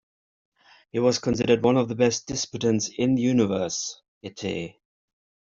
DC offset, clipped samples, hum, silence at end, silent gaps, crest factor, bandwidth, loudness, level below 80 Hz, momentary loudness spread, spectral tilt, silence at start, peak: under 0.1%; under 0.1%; none; 0.9 s; 4.08-4.21 s; 20 dB; 7.6 kHz; -24 LUFS; -58 dBFS; 13 LU; -5 dB/octave; 0.95 s; -6 dBFS